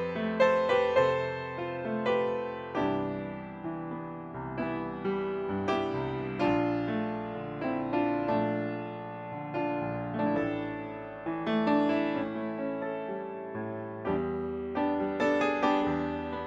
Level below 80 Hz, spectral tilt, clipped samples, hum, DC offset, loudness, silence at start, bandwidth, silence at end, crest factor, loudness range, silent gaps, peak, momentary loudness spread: -60 dBFS; -7.5 dB/octave; under 0.1%; none; under 0.1%; -31 LUFS; 0 s; 7.8 kHz; 0 s; 18 dB; 3 LU; none; -12 dBFS; 11 LU